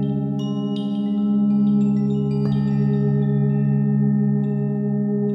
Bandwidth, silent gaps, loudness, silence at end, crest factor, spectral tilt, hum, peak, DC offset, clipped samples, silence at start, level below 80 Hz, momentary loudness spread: 5.6 kHz; none; -20 LUFS; 0 s; 10 dB; -10.5 dB/octave; none; -10 dBFS; under 0.1%; under 0.1%; 0 s; -52 dBFS; 5 LU